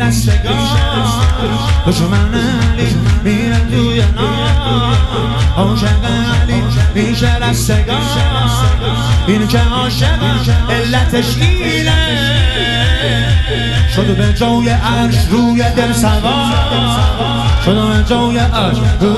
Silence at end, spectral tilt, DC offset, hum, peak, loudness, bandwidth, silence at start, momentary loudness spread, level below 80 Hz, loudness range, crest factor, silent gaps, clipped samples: 0 s; -5.5 dB/octave; under 0.1%; none; 0 dBFS; -12 LUFS; 13 kHz; 0 s; 2 LU; -18 dBFS; 1 LU; 12 dB; none; under 0.1%